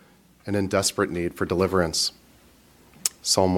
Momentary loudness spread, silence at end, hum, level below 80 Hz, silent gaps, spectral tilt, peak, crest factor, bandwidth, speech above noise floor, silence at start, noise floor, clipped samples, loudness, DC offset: 6 LU; 0 s; none; -52 dBFS; none; -3.5 dB/octave; -2 dBFS; 24 dB; 17.5 kHz; 32 dB; 0.45 s; -55 dBFS; under 0.1%; -24 LUFS; under 0.1%